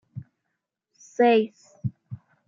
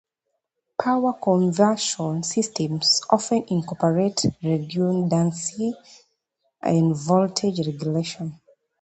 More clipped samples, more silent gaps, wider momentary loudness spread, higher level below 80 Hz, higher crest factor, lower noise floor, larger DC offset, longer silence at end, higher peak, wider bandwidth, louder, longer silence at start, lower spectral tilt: neither; neither; first, 24 LU vs 9 LU; second, -72 dBFS vs -60 dBFS; about the same, 18 dB vs 20 dB; about the same, -81 dBFS vs -79 dBFS; neither; second, 0.3 s vs 0.45 s; second, -8 dBFS vs -2 dBFS; second, 7.6 kHz vs 9 kHz; about the same, -24 LUFS vs -22 LUFS; second, 0.15 s vs 0.8 s; first, -6.5 dB/octave vs -5 dB/octave